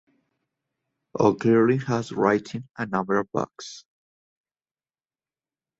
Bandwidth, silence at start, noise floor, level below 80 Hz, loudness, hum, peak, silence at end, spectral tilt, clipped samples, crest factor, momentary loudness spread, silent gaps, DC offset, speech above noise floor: 8 kHz; 1.15 s; under -90 dBFS; -64 dBFS; -24 LUFS; none; -4 dBFS; 2 s; -7 dB/octave; under 0.1%; 22 dB; 19 LU; none; under 0.1%; over 67 dB